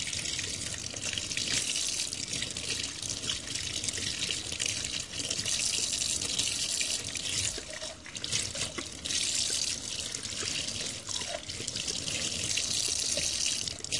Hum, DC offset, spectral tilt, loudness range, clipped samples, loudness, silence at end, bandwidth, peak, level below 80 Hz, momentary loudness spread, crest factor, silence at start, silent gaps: none; under 0.1%; -0.5 dB/octave; 2 LU; under 0.1%; -30 LUFS; 0 s; 11.5 kHz; -10 dBFS; -56 dBFS; 6 LU; 24 dB; 0 s; none